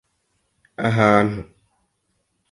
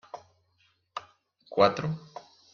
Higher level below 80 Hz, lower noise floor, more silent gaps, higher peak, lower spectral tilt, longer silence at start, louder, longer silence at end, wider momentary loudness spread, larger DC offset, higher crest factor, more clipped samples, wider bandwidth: first, -52 dBFS vs -66 dBFS; about the same, -71 dBFS vs -70 dBFS; neither; first, -2 dBFS vs -6 dBFS; about the same, -7 dB/octave vs -6 dB/octave; first, 0.8 s vs 0.15 s; first, -18 LUFS vs -27 LUFS; first, 1.1 s vs 0.35 s; second, 18 LU vs 23 LU; neither; second, 20 dB vs 26 dB; neither; first, 11 kHz vs 7 kHz